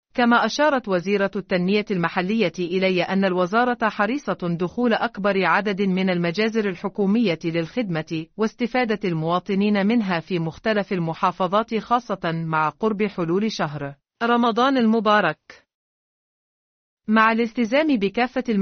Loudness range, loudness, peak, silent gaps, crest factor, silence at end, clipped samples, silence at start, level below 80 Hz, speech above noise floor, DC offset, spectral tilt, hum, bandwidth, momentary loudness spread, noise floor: 2 LU; -21 LUFS; -4 dBFS; 15.74-16.97 s; 16 dB; 0 s; under 0.1%; 0.15 s; -60 dBFS; over 69 dB; under 0.1%; -4.5 dB/octave; none; 6.6 kHz; 7 LU; under -90 dBFS